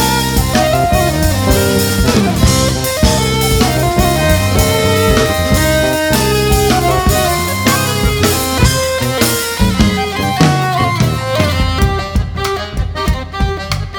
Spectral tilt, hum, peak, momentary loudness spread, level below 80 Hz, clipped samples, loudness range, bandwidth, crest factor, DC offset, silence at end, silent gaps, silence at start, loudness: -4.5 dB/octave; none; 0 dBFS; 6 LU; -20 dBFS; under 0.1%; 2 LU; 19.5 kHz; 12 dB; under 0.1%; 0 s; none; 0 s; -13 LUFS